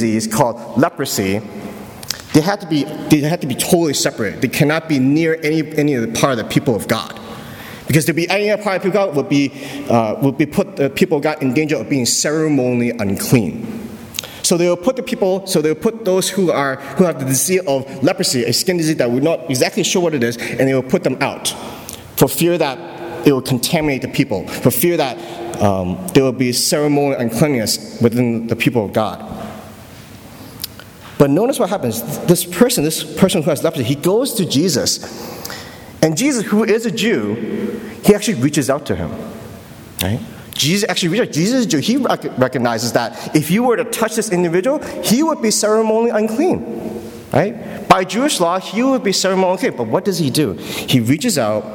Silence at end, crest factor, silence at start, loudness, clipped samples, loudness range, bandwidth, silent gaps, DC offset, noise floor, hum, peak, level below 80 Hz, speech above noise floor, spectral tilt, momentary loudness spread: 0 s; 16 dB; 0 s; -16 LUFS; under 0.1%; 2 LU; 19.5 kHz; none; under 0.1%; -37 dBFS; none; 0 dBFS; -50 dBFS; 21 dB; -4.5 dB/octave; 13 LU